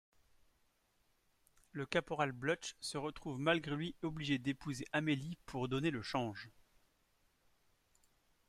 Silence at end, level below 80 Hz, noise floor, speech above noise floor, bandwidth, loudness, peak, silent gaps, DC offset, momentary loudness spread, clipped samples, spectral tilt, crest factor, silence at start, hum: 2 s; -68 dBFS; -77 dBFS; 38 dB; 14 kHz; -39 LUFS; -20 dBFS; none; under 0.1%; 9 LU; under 0.1%; -5 dB/octave; 22 dB; 1.75 s; none